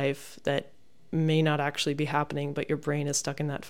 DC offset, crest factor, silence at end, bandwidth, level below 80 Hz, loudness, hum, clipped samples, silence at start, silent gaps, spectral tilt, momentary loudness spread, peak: 0.4%; 18 dB; 0 s; 16 kHz; -64 dBFS; -29 LUFS; none; under 0.1%; 0 s; none; -5 dB/octave; 7 LU; -10 dBFS